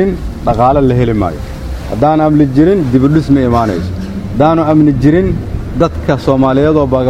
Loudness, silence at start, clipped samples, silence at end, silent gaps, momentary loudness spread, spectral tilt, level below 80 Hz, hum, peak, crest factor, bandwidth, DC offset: -11 LUFS; 0 s; 0.2%; 0 s; none; 11 LU; -8.5 dB/octave; -24 dBFS; none; 0 dBFS; 10 dB; 12 kHz; under 0.1%